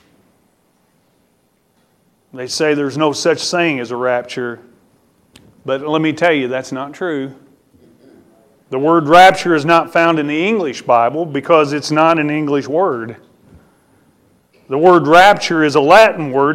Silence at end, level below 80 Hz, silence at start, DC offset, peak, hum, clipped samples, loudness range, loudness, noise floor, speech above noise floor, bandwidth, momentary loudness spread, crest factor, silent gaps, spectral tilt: 0 s; -54 dBFS; 2.35 s; under 0.1%; 0 dBFS; none; under 0.1%; 8 LU; -13 LUFS; -59 dBFS; 46 dB; 16 kHz; 16 LU; 14 dB; none; -5 dB/octave